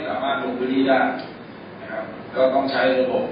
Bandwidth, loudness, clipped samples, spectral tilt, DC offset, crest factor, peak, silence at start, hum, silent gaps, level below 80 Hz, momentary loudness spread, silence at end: 5.2 kHz; -21 LUFS; under 0.1%; -10 dB/octave; under 0.1%; 16 dB; -6 dBFS; 0 s; none; none; -60 dBFS; 18 LU; 0 s